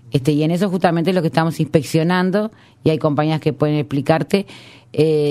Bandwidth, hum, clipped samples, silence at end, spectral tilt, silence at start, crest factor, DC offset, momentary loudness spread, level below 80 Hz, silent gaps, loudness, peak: 14.5 kHz; none; under 0.1%; 0 s; -7 dB/octave; 0.05 s; 18 dB; under 0.1%; 5 LU; -54 dBFS; none; -18 LUFS; 0 dBFS